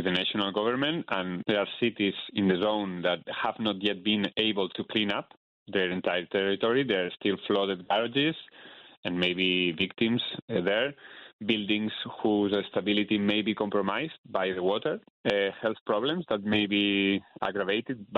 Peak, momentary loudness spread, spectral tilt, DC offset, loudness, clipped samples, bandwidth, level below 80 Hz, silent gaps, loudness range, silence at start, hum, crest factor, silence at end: -8 dBFS; 6 LU; -7 dB/octave; under 0.1%; -28 LUFS; under 0.1%; 6.8 kHz; -68 dBFS; 5.37-5.66 s, 8.97-9.03 s, 10.42-10.48 s, 11.33-11.39 s, 14.18-14.24 s, 15.10-15.24 s, 15.81-15.86 s; 1 LU; 0 s; none; 20 dB; 0 s